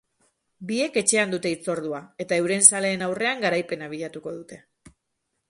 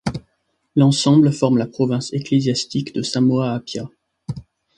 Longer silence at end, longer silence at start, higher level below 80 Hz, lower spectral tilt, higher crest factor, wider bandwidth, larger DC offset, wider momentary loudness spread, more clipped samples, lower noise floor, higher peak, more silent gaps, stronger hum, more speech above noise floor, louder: first, 0.9 s vs 0.35 s; first, 0.6 s vs 0.05 s; second, -68 dBFS vs -52 dBFS; second, -2.5 dB/octave vs -6 dB/octave; first, 26 dB vs 16 dB; about the same, 12 kHz vs 11 kHz; neither; about the same, 19 LU vs 18 LU; neither; first, -78 dBFS vs -69 dBFS; about the same, 0 dBFS vs -2 dBFS; neither; neither; about the same, 54 dB vs 51 dB; second, -22 LUFS vs -18 LUFS